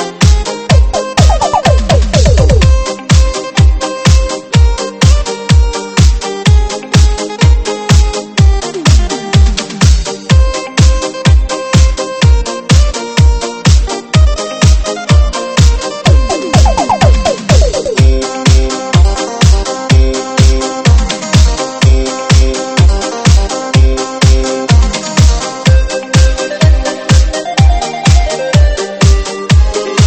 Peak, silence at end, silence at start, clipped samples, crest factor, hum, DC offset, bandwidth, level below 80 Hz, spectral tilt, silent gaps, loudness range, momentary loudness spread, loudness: 0 dBFS; 0 s; 0 s; 1%; 8 dB; none; under 0.1%; 8.8 kHz; -10 dBFS; -5 dB/octave; none; 1 LU; 3 LU; -10 LUFS